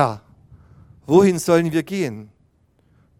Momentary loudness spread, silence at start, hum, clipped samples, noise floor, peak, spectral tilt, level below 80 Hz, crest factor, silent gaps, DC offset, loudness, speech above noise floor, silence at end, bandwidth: 17 LU; 0 s; none; under 0.1%; -60 dBFS; -2 dBFS; -6.5 dB/octave; -58 dBFS; 20 dB; none; under 0.1%; -18 LUFS; 42 dB; 0.95 s; 16 kHz